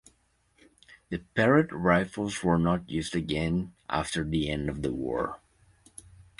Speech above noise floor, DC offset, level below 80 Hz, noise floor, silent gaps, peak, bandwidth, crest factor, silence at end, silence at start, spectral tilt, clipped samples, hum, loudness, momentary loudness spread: 41 dB; under 0.1%; -48 dBFS; -68 dBFS; none; -8 dBFS; 11.5 kHz; 22 dB; 0.2 s; 0.9 s; -6 dB/octave; under 0.1%; none; -28 LUFS; 15 LU